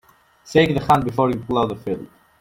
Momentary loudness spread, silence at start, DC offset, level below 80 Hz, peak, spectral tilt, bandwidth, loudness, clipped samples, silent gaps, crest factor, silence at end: 11 LU; 0.45 s; under 0.1%; -48 dBFS; -2 dBFS; -6.5 dB/octave; 16.5 kHz; -20 LUFS; under 0.1%; none; 18 dB; 0.35 s